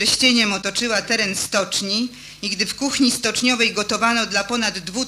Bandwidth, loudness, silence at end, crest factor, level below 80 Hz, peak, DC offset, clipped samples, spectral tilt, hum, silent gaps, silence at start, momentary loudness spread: 15.5 kHz; -19 LUFS; 0 s; 18 dB; -52 dBFS; -4 dBFS; under 0.1%; under 0.1%; -2 dB/octave; none; none; 0 s; 7 LU